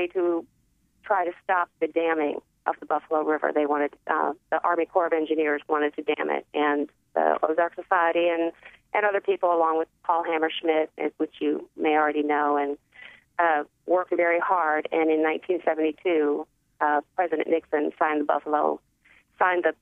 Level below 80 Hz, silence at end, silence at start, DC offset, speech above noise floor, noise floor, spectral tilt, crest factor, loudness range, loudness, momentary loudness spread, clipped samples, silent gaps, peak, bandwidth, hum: -74 dBFS; 0.1 s; 0 s; under 0.1%; 39 dB; -64 dBFS; -6 dB/octave; 18 dB; 2 LU; -25 LUFS; 6 LU; under 0.1%; none; -8 dBFS; 3.8 kHz; none